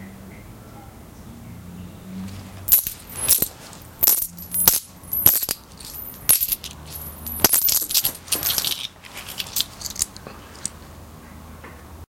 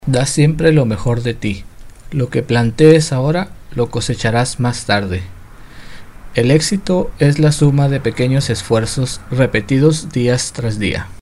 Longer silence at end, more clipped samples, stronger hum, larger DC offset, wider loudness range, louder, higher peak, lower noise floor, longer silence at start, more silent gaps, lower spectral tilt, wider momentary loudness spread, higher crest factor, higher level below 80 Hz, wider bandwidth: about the same, 0.1 s vs 0.05 s; second, under 0.1% vs 0.1%; neither; neither; first, 7 LU vs 3 LU; second, -19 LUFS vs -15 LUFS; about the same, 0 dBFS vs 0 dBFS; first, -41 dBFS vs -34 dBFS; about the same, 0 s vs 0.05 s; neither; second, -1 dB/octave vs -6 dB/octave; first, 24 LU vs 9 LU; first, 24 dB vs 14 dB; second, -48 dBFS vs -34 dBFS; first, 17.5 kHz vs 12.5 kHz